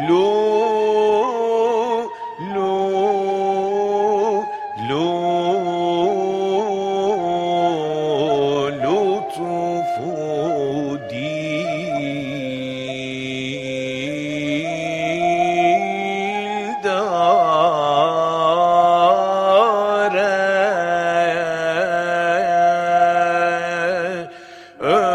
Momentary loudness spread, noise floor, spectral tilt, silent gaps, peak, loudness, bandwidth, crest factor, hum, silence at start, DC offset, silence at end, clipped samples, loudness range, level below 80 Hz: 9 LU; -39 dBFS; -5.5 dB/octave; none; -2 dBFS; -19 LUFS; 11 kHz; 16 dB; none; 0 s; under 0.1%; 0 s; under 0.1%; 7 LU; -60 dBFS